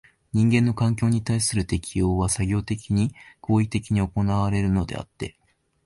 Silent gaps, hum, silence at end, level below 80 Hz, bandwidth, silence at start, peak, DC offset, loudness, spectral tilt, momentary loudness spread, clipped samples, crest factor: none; none; 0.55 s; -40 dBFS; 11.5 kHz; 0.35 s; -8 dBFS; under 0.1%; -24 LUFS; -6 dB/octave; 11 LU; under 0.1%; 14 dB